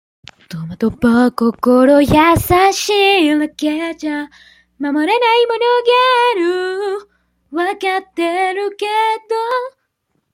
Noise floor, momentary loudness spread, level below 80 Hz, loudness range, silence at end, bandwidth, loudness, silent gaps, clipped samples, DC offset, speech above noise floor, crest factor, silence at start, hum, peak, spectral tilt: -68 dBFS; 12 LU; -42 dBFS; 6 LU; 0.65 s; 16.5 kHz; -14 LUFS; none; under 0.1%; under 0.1%; 53 dB; 14 dB; 0.5 s; none; -2 dBFS; -4.5 dB/octave